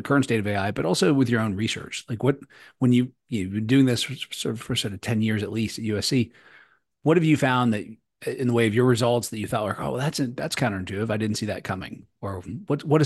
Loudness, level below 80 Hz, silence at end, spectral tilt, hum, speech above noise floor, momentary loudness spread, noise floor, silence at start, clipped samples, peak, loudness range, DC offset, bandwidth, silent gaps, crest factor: -24 LUFS; -58 dBFS; 0 s; -5.5 dB/octave; none; 33 dB; 12 LU; -57 dBFS; 0 s; under 0.1%; -6 dBFS; 4 LU; under 0.1%; 12.5 kHz; none; 18 dB